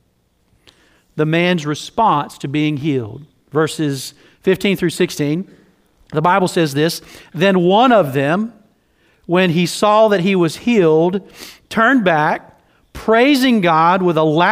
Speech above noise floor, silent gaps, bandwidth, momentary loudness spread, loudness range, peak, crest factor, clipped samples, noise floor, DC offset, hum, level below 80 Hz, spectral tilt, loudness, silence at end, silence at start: 46 dB; none; 16 kHz; 13 LU; 4 LU; 0 dBFS; 16 dB; under 0.1%; -61 dBFS; under 0.1%; none; -52 dBFS; -5.5 dB/octave; -15 LUFS; 0 s; 1.15 s